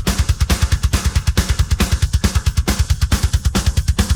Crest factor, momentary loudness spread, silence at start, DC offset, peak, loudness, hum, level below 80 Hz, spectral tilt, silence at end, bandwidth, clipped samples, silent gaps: 14 dB; 1 LU; 0 s; under 0.1%; -2 dBFS; -18 LUFS; none; -18 dBFS; -4.5 dB/octave; 0 s; over 20 kHz; under 0.1%; none